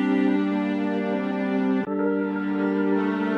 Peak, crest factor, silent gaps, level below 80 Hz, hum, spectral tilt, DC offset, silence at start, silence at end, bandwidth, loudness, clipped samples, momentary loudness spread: -12 dBFS; 12 dB; none; -66 dBFS; none; -8.5 dB/octave; under 0.1%; 0 s; 0 s; 6.2 kHz; -24 LUFS; under 0.1%; 4 LU